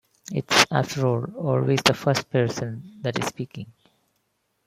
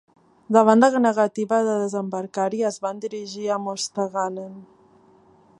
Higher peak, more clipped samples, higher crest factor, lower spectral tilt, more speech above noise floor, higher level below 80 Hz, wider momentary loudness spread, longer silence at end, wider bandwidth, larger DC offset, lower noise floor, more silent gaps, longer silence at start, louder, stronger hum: about the same, 0 dBFS vs -2 dBFS; neither; about the same, 24 dB vs 20 dB; about the same, -4.5 dB/octave vs -5 dB/octave; first, 49 dB vs 33 dB; first, -60 dBFS vs -74 dBFS; first, 16 LU vs 13 LU; about the same, 0.95 s vs 0.95 s; first, 16 kHz vs 11.5 kHz; neither; first, -73 dBFS vs -55 dBFS; neither; second, 0.3 s vs 0.5 s; about the same, -23 LUFS vs -22 LUFS; neither